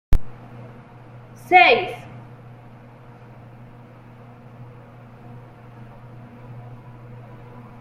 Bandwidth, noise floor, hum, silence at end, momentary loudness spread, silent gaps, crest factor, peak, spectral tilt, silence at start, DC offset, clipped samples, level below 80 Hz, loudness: 12.5 kHz; -44 dBFS; none; 1.2 s; 29 LU; none; 22 dB; -2 dBFS; -5.5 dB/octave; 0.1 s; under 0.1%; under 0.1%; -34 dBFS; -16 LUFS